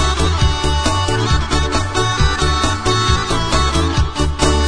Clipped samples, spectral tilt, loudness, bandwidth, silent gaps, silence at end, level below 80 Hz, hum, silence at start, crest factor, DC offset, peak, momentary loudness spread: under 0.1%; -4.5 dB/octave; -16 LUFS; 10.5 kHz; none; 0 s; -20 dBFS; none; 0 s; 14 dB; 1%; -2 dBFS; 2 LU